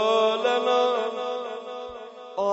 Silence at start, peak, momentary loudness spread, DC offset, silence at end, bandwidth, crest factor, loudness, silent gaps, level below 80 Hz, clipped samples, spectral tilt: 0 s; -10 dBFS; 15 LU; under 0.1%; 0 s; 8 kHz; 14 dB; -25 LUFS; none; -68 dBFS; under 0.1%; -3 dB/octave